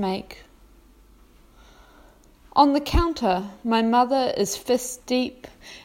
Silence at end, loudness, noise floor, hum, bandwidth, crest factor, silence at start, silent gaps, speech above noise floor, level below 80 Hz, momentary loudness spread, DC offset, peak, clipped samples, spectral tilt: 0.05 s; -23 LUFS; -53 dBFS; none; 16 kHz; 22 dB; 0 s; none; 30 dB; -36 dBFS; 13 LU; under 0.1%; -4 dBFS; under 0.1%; -4.5 dB/octave